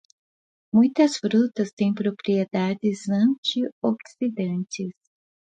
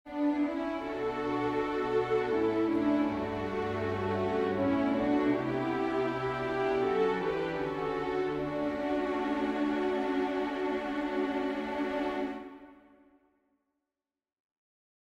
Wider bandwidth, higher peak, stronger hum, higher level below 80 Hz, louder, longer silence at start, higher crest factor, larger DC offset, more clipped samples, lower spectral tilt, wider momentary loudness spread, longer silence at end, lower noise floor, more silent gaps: about the same, 9.2 kHz vs 8.4 kHz; first, -6 dBFS vs -16 dBFS; neither; second, -70 dBFS vs -58 dBFS; first, -24 LUFS vs -31 LUFS; first, 0.75 s vs 0.05 s; about the same, 18 dB vs 14 dB; neither; neither; about the same, -6 dB/octave vs -7 dB/octave; first, 9 LU vs 5 LU; second, 0.7 s vs 2.3 s; about the same, under -90 dBFS vs under -90 dBFS; first, 1.73-1.77 s, 3.38-3.43 s, 3.72-3.82 s vs none